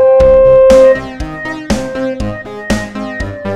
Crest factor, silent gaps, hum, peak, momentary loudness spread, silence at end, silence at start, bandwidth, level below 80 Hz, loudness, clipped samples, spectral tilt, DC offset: 10 dB; none; none; 0 dBFS; 16 LU; 0 s; 0 s; 11.5 kHz; -26 dBFS; -10 LUFS; 0.2%; -6 dB/octave; under 0.1%